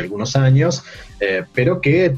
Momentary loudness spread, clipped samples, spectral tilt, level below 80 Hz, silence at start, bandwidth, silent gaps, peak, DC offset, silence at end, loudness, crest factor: 10 LU; under 0.1%; -6.5 dB/octave; -44 dBFS; 0 s; 7.4 kHz; none; -4 dBFS; under 0.1%; 0 s; -17 LUFS; 12 dB